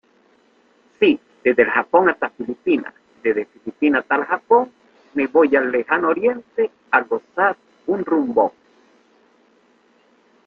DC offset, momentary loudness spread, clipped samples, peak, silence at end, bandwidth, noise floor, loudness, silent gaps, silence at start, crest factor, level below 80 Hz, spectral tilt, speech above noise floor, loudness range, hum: under 0.1%; 9 LU; under 0.1%; -2 dBFS; 1.95 s; 4.9 kHz; -57 dBFS; -19 LUFS; none; 1 s; 20 dB; -64 dBFS; -7.5 dB/octave; 39 dB; 3 LU; 60 Hz at -60 dBFS